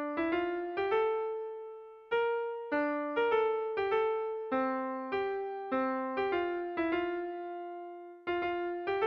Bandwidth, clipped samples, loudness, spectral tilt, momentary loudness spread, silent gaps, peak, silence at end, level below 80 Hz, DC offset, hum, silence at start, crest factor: 5.6 kHz; under 0.1%; -33 LUFS; -6.5 dB/octave; 11 LU; none; -18 dBFS; 0 s; -70 dBFS; under 0.1%; none; 0 s; 14 dB